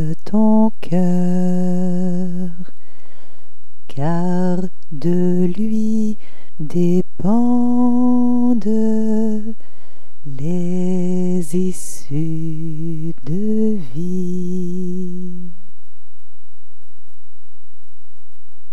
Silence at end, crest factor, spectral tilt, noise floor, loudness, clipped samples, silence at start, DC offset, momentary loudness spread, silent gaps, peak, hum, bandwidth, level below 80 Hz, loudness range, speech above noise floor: 3.2 s; 16 dB; -8.5 dB/octave; -59 dBFS; -19 LUFS; under 0.1%; 0 s; 20%; 14 LU; none; -4 dBFS; none; 12.5 kHz; -58 dBFS; 9 LU; 43 dB